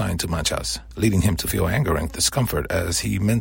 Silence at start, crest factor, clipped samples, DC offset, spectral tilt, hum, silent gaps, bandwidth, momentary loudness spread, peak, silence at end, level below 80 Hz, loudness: 0 s; 18 dB; under 0.1%; under 0.1%; -4.5 dB/octave; none; none; 16.5 kHz; 4 LU; -4 dBFS; 0 s; -36 dBFS; -22 LUFS